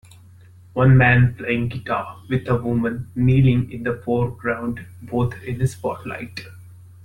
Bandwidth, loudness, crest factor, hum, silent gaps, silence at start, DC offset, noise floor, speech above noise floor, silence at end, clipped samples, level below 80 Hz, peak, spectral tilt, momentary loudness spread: 10.5 kHz; -20 LUFS; 18 dB; none; none; 0.75 s; under 0.1%; -46 dBFS; 26 dB; 0.3 s; under 0.1%; -42 dBFS; -2 dBFS; -8 dB/octave; 15 LU